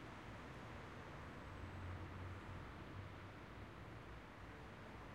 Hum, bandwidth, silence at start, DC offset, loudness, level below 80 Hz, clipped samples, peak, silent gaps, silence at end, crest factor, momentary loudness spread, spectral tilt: none; 15.5 kHz; 0 s; under 0.1%; -54 LUFS; -62 dBFS; under 0.1%; -38 dBFS; none; 0 s; 14 dB; 4 LU; -6.5 dB/octave